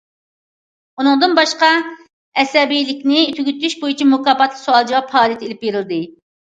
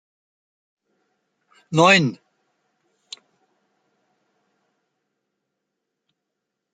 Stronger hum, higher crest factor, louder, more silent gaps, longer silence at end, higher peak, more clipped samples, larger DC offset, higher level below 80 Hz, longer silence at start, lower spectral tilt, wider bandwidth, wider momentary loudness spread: neither; second, 16 dB vs 26 dB; about the same, -15 LUFS vs -17 LUFS; first, 2.13-2.32 s vs none; second, 0.35 s vs 4.6 s; about the same, 0 dBFS vs -2 dBFS; neither; neither; about the same, -70 dBFS vs -68 dBFS; second, 1 s vs 1.7 s; second, -3 dB/octave vs -4.5 dB/octave; about the same, 9 kHz vs 9.4 kHz; second, 10 LU vs 26 LU